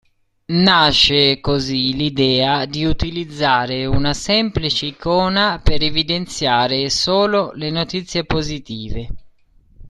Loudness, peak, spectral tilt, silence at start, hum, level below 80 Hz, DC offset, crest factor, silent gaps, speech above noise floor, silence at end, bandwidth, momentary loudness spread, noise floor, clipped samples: -17 LUFS; 0 dBFS; -4.5 dB/octave; 0.5 s; none; -32 dBFS; under 0.1%; 16 dB; none; 34 dB; 0 s; 12 kHz; 11 LU; -51 dBFS; under 0.1%